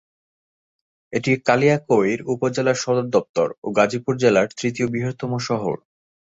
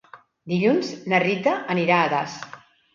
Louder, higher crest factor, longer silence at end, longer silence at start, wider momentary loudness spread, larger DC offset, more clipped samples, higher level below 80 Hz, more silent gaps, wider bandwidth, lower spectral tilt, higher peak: about the same, -21 LUFS vs -22 LUFS; about the same, 20 dB vs 18 dB; first, 0.65 s vs 0.4 s; first, 1.1 s vs 0.15 s; second, 8 LU vs 12 LU; neither; neither; first, -60 dBFS vs -68 dBFS; first, 3.29-3.34 s, 3.58-3.62 s vs none; about the same, 8 kHz vs 7.4 kHz; about the same, -5.5 dB/octave vs -6 dB/octave; first, -2 dBFS vs -6 dBFS